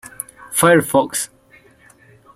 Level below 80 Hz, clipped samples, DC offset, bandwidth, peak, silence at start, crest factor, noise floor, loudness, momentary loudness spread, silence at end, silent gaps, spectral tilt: -58 dBFS; under 0.1%; under 0.1%; 16.5 kHz; -2 dBFS; 0.05 s; 18 dB; -50 dBFS; -16 LUFS; 18 LU; 1.1 s; none; -4 dB/octave